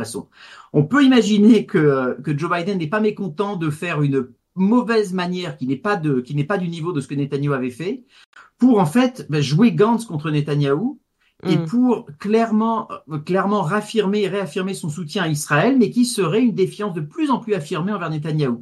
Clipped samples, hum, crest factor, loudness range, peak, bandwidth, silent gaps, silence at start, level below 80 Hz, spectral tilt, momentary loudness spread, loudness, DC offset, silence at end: under 0.1%; none; 16 dB; 4 LU; -2 dBFS; 12.5 kHz; 8.26-8.33 s; 0 s; -64 dBFS; -6.5 dB/octave; 10 LU; -19 LUFS; under 0.1%; 0 s